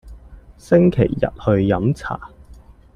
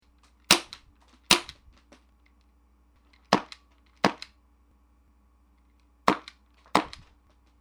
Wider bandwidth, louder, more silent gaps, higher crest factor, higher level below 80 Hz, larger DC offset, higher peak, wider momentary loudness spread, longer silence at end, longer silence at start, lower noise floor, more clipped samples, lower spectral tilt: second, 10.5 kHz vs over 20 kHz; first, -18 LUFS vs -26 LUFS; neither; second, 18 dB vs 28 dB; first, -40 dBFS vs -58 dBFS; neither; about the same, -2 dBFS vs -2 dBFS; second, 12 LU vs 25 LU; about the same, 0.7 s vs 0.7 s; second, 0.05 s vs 0.5 s; second, -44 dBFS vs -62 dBFS; neither; first, -9 dB/octave vs -2 dB/octave